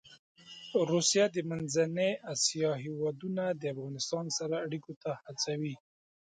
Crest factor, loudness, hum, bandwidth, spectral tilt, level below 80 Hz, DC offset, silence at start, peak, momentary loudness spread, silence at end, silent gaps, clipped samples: 18 dB; -32 LUFS; none; 9.6 kHz; -3.5 dB/octave; -76 dBFS; under 0.1%; 0.05 s; -16 dBFS; 12 LU; 0.55 s; 0.19-0.35 s, 4.96-5.01 s; under 0.1%